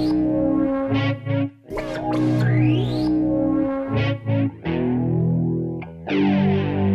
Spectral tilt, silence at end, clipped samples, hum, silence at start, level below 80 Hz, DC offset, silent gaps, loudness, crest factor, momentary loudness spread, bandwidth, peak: -9 dB/octave; 0 s; under 0.1%; none; 0 s; -44 dBFS; under 0.1%; none; -21 LUFS; 12 dB; 7 LU; 7.4 kHz; -8 dBFS